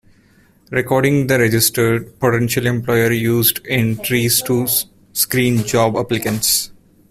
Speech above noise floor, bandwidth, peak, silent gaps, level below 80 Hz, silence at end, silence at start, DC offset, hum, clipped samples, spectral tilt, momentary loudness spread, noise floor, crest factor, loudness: 36 dB; 16 kHz; 0 dBFS; none; -48 dBFS; 0.4 s; 0.7 s; under 0.1%; none; under 0.1%; -4 dB/octave; 5 LU; -52 dBFS; 16 dB; -16 LUFS